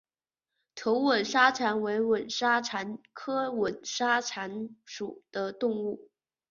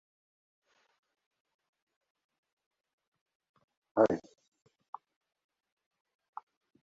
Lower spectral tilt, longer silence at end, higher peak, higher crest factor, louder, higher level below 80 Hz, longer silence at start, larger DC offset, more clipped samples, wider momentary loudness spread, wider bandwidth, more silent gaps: second, -3 dB/octave vs -6.5 dB/octave; second, 0.5 s vs 2.6 s; first, -8 dBFS vs -12 dBFS; second, 22 dB vs 30 dB; about the same, -29 LUFS vs -31 LUFS; first, -72 dBFS vs -78 dBFS; second, 0.75 s vs 3.95 s; neither; neither; second, 16 LU vs 23 LU; about the same, 7.4 kHz vs 7.4 kHz; neither